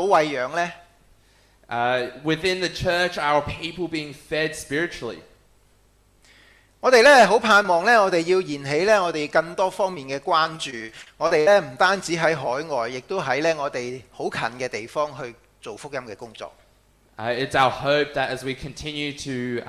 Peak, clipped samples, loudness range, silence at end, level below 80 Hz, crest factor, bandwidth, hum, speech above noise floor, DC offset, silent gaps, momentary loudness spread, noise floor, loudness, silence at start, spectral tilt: -4 dBFS; under 0.1%; 12 LU; 0 s; -54 dBFS; 18 dB; 14.5 kHz; none; 37 dB; under 0.1%; none; 17 LU; -59 dBFS; -21 LUFS; 0 s; -4 dB/octave